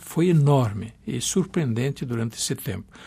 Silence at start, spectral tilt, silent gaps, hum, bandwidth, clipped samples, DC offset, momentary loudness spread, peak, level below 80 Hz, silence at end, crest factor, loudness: 0 s; -5.5 dB/octave; none; none; 15.5 kHz; under 0.1%; under 0.1%; 12 LU; -8 dBFS; -54 dBFS; 0 s; 16 dB; -24 LUFS